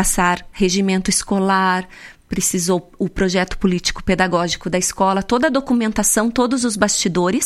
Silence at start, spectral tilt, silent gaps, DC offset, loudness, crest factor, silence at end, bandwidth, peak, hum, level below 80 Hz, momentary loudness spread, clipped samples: 0 s; -3.5 dB/octave; none; under 0.1%; -18 LUFS; 18 dB; 0 s; 15 kHz; 0 dBFS; none; -36 dBFS; 4 LU; under 0.1%